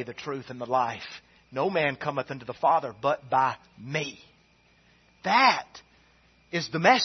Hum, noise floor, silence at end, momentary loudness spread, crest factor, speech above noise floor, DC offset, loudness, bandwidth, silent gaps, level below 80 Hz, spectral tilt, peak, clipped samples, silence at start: none; -62 dBFS; 0 s; 17 LU; 22 dB; 35 dB; under 0.1%; -27 LUFS; 6.4 kHz; none; -68 dBFS; -4 dB/octave; -4 dBFS; under 0.1%; 0 s